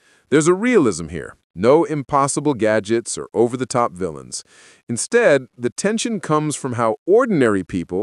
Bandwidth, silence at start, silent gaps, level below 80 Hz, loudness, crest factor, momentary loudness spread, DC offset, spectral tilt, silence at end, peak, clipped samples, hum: 12 kHz; 0.3 s; 1.44-1.54 s, 4.83-4.87 s, 5.72-5.76 s, 6.98-7.06 s; -52 dBFS; -18 LUFS; 16 dB; 12 LU; under 0.1%; -5 dB/octave; 0 s; -2 dBFS; under 0.1%; none